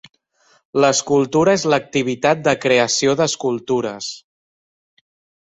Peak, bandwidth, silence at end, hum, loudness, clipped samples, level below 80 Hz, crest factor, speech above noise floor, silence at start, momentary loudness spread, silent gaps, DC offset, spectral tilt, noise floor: -2 dBFS; 8.4 kHz; 1.25 s; none; -17 LUFS; under 0.1%; -58 dBFS; 16 dB; 41 dB; 0.75 s; 10 LU; none; under 0.1%; -4 dB/octave; -58 dBFS